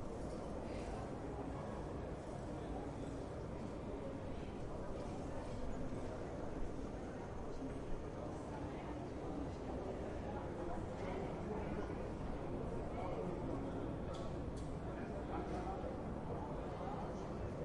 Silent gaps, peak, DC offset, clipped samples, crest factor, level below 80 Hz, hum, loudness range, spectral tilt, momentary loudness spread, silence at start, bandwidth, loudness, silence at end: none; -30 dBFS; under 0.1%; under 0.1%; 14 dB; -52 dBFS; none; 2 LU; -7.5 dB/octave; 3 LU; 0 s; 11 kHz; -46 LUFS; 0 s